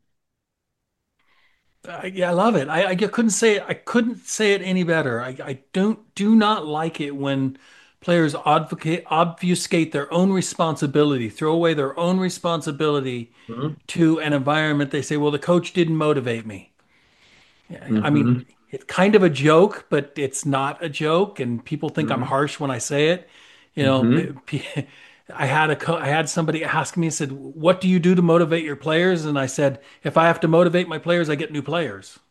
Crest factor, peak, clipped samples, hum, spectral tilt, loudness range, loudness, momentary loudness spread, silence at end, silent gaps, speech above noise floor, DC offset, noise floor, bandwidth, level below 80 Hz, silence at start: 20 dB; -2 dBFS; under 0.1%; none; -5.5 dB/octave; 3 LU; -21 LUFS; 11 LU; 0.2 s; none; 59 dB; under 0.1%; -79 dBFS; 12.5 kHz; -66 dBFS; 1.85 s